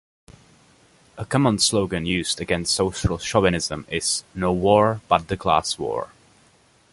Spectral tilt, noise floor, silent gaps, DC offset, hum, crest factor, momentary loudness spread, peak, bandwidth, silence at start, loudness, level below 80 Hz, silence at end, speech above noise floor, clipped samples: -4 dB/octave; -57 dBFS; none; under 0.1%; none; 22 dB; 8 LU; -2 dBFS; 11.5 kHz; 1.15 s; -21 LUFS; -44 dBFS; 0.85 s; 36 dB; under 0.1%